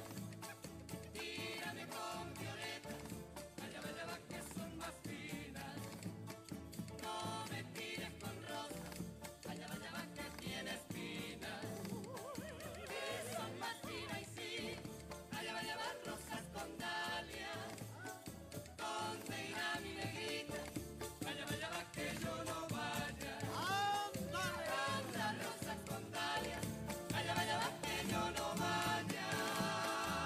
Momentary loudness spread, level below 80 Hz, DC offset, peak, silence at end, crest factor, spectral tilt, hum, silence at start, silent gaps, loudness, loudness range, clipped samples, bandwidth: 10 LU; -66 dBFS; under 0.1%; -26 dBFS; 0 s; 18 dB; -3.5 dB/octave; none; 0 s; none; -44 LUFS; 7 LU; under 0.1%; 15.5 kHz